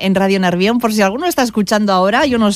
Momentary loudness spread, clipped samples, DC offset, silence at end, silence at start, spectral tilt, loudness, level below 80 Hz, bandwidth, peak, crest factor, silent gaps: 3 LU; under 0.1%; under 0.1%; 0 s; 0 s; -5 dB/octave; -14 LUFS; -46 dBFS; 15.5 kHz; -2 dBFS; 12 dB; none